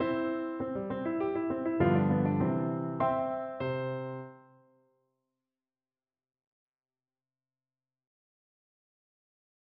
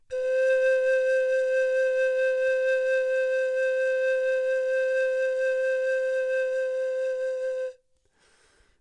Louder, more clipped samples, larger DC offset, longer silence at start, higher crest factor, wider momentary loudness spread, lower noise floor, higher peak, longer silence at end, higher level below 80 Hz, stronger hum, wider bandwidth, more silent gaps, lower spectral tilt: second, -32 LUFS vs -25 LUFS; neither; neither; about the same, 0 s vs 0.1 s; first, 20 dB vs 10 dB; first, 9 LU vs 5 LU; first, under -90 dBFS vs -66 dBFS; about the same, -14 dBFS vs -14 dBFS; first, 5.35 s vs 1.1 s; first, -64 dBFS vs -72 dBFS; neither; second, 4.5 kHz vs 9.8 kHz; neither; first, -7.5 dB/octave vs 0 dB/octave